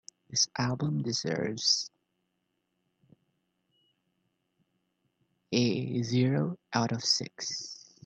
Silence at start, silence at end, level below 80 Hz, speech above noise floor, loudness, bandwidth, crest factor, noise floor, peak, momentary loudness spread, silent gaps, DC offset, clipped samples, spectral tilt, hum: 0.3 s; 0.3 s; -72 dBFS; 50 dB; -29 LUFS; 8.8 kHz; 22 dB; -80 dBFS; -10 dBFS; 9 LU; none; under 0.1%; under 0.1%; -4 dB/octave; none